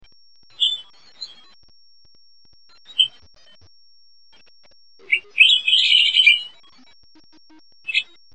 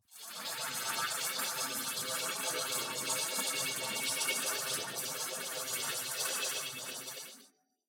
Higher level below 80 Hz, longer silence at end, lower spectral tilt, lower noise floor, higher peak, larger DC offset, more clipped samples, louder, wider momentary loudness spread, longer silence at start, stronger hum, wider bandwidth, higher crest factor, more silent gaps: first, -70 dBFS vs under -90 dBFS; about the same, 0.3 s vs 0.4 s; second, 3 dB/octave vs 0 dB/octave; second, -56 dBFS vs -64 dBFS; first, -2 dBFS vs -20 dBFS; first, 0.4% vs under 0.1%; neither; first, -15 LUFS vs -34 LUFS; first, 24 LU vs 8 LU; first, 0.6 s vs 0.1 s; neither; second, 9 kHz vs over 20 kHz; about the same, 22 dB vs 18 dB; neither